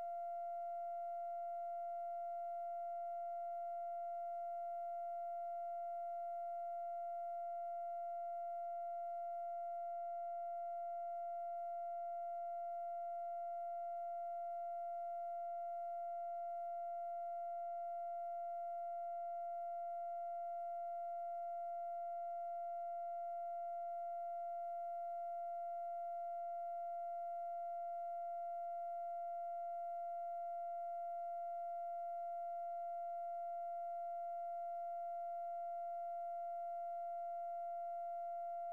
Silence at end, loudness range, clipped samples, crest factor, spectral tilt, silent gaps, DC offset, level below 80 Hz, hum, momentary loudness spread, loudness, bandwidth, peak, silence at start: 0 s; 0 LU; under 0.1%; 4 dB; -3.5 dB/octave; none; under 0.1%; under -90 dBFS; none; 0 LU; -45 LUFS; 2.9 kHz; -42 dBFS; 0 s